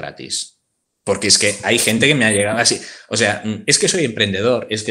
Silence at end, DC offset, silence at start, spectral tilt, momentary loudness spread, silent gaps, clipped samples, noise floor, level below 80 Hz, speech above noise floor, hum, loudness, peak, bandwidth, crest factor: 0 s; under 0.1%; 0 s; -2.5 dB/octave; 11 LU; none; under 0.1%; -71 dBFS; -56 dBFS; 54 dB; none; -16 LUFS; 0 dBFS; 16 kHz; 18 dB